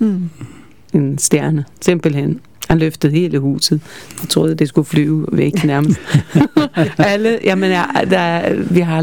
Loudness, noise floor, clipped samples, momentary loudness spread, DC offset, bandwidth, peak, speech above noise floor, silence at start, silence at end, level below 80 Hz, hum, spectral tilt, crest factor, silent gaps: -15 LUFS; -39 dBFS; under 0.1%; 6 LU; 0.7%; 19 kHz; 0 dBFS; 24 dB; 0 s; 0 s; -44 dBFS; none; -5.5 dB/octave; 14 dB; none